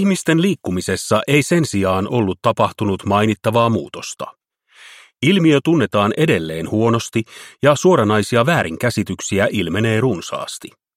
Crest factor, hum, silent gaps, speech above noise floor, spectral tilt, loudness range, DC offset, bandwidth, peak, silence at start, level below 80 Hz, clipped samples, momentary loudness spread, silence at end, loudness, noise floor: 16 dB; none; none; 32 dB; -5.5 dB/octave; 3 LU; under 0.1%; 16 kHz; 0 dBFS; 0 s; -52 dBFS; under 0.1%; 10 LU; 0.3 s; -17 LUFS; -48 dBFS